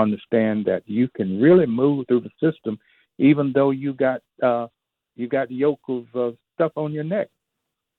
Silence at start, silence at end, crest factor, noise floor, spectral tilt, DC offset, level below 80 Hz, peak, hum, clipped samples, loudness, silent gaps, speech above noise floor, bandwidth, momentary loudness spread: 0 s; 0.75 s; 16 dB; -80 dBFS; -11 dB/octave; under 0.1%; -66 dBFS; -6 dBFS; none; under 0.1%; -21 LUFS; none; 60 dB; 4.2 kHz; 12 LU